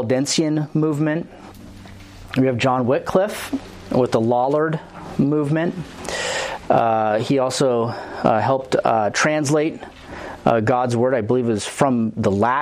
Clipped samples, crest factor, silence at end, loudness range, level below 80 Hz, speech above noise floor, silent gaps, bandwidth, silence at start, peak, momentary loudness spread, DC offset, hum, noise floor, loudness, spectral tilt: under 0.1%; 18 dB; 0 s; 2 LU; -50 dBFS; 21 dB; none; 15.5 kHz; 0 s; 0 dBFS; 11 LU; under 0.1%; none; -39 dBFS; -20 LUFS; -5.5 dB/octave